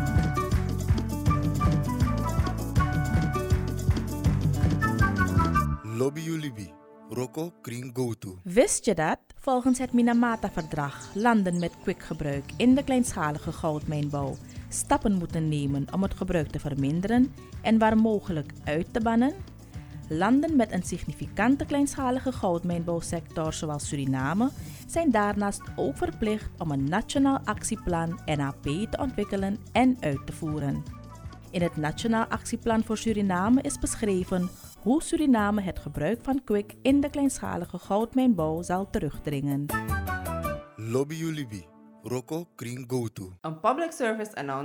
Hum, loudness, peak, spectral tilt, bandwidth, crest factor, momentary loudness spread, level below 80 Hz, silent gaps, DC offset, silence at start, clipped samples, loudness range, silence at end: none; -27 LUFS; -8 dBFS; -6 dB/octave; 19.5 kHz; 20 dB; 11 LU; -40 dBFS; none; under 0.1%; 0 s; under 0.1%; 4 LU; 0 s